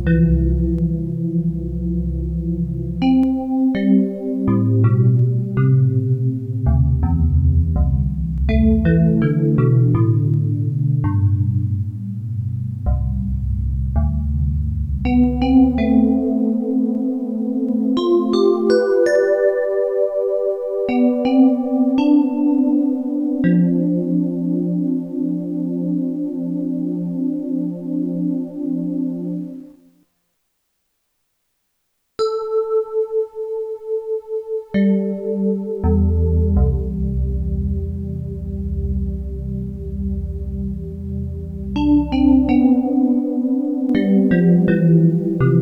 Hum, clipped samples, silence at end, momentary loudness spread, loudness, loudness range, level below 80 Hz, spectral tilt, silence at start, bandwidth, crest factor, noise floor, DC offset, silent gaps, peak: none; under 0.1%; 0 s; 10 LU; -18 LUFS; 8 LU; -28 dBFS; -10 dB/octave; 0 s; 7 kHz; 14 dB; -70 dBFS; under 0.1%; none; -4 dBFS